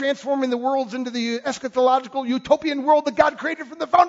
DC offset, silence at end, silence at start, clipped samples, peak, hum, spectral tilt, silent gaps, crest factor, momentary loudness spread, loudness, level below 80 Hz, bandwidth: under 0.1%; 0 s; 0 s; under 0.1%; -2 dBFS; none; -4 dB/octave; none; 18 dB; 7 LU; -21 LUFS; -60 dBFS; 7.8 kHz